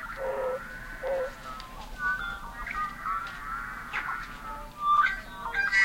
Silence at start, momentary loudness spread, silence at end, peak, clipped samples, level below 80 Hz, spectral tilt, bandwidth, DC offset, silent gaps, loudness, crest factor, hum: 0 s; 15 LU; 0 s; -14 dBFS; under 0.1%; -48 dBFS; -3 dB/octave; 16.5 kHz; under 0.1%; none; -31 LUFS; 18 dB; none